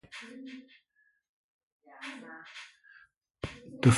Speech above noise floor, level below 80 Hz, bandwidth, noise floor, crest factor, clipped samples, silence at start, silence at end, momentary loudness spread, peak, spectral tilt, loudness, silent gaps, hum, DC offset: 28 dB; -60 dBFS; 11.5 kHz; -60 dBFS; 24 dB; under 0.1%; 0.15 s; 0 s; 15 LU; -10 dBFS; -6 dB/octave; -39 LUFS; 1.29-1.80 s, 3.17-3.21 s; none; under 0.1%